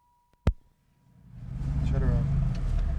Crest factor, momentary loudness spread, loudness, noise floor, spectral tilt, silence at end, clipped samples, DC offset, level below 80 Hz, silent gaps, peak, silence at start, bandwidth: 18 dB; 15 LU; -30 LUFS; -63 dBFS; -9 dB/octave; 0 s; under 0.1%; under 0.1%; -32 dBFS; none; -10 dBFS; 0.45 s; 8 kHz